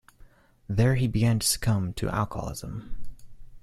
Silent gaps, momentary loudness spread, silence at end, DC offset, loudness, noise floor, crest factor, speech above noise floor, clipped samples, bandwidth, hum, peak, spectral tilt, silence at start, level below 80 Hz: none; 15 LU; 0.05 s; under 0.1%; -26 LUFS; -54 dBFS; 18 dB; 28 dB; under 0.1%; 15 kHz; none; -10 dBFS; -5 dB/octave; 0.7 s; -42 dBFS